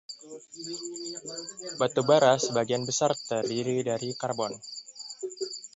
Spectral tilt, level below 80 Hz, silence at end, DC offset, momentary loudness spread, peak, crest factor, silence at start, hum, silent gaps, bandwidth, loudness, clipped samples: -3.5 dB/octave; -74 dBFS; 0.1 s; under 0.1%; 18 LU; -8 dBFS; 20 dB; 0.1 s; none; none; 8.2 kHz; -28 LUFS; under 0.1%